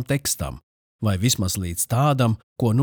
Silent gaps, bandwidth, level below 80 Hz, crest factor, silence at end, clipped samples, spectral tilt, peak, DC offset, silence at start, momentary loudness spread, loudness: 0.63-0.99 s, 2.43-2.56 s; over 20 kHz; -46 dBFS; 16 dB; 0 s; under 0.1%; -5 dB/octave; -6 dBFS; under 0.1%; 0 s; 8 LU; -22 LUFS